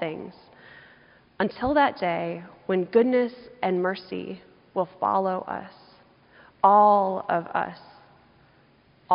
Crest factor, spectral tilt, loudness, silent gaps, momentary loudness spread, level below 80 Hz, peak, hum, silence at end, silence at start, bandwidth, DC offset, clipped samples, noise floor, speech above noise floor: 22 dB; -4.5 dB/octave; -24 LUFS; none; 16 LU; -60 dBFS; -4 dBFS; none; 0 s; 0 s; 5.4 kHz; under 0.1%; under 0.1%; -59 dBFS; 35 dB